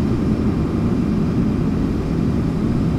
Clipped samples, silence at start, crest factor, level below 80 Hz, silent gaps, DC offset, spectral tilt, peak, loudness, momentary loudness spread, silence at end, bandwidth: under 0.1%; 0 s; 12 dB; -28 dBFS; none; under 0.1%; -9 dB/octave; -6 dBFS; -19 LUFS; 1 LU; 0 s; 11.5 kHz